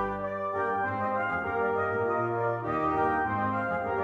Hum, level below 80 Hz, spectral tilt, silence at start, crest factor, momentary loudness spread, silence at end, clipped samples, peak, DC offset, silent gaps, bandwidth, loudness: none; -56 dBFS; -8.5 dB/octave; 0 s; 14 dB; 3 LU; 0 s; under 0.1%; -14 dBFS; under 0.1%; none; 7.4 kHz; -29 LUFS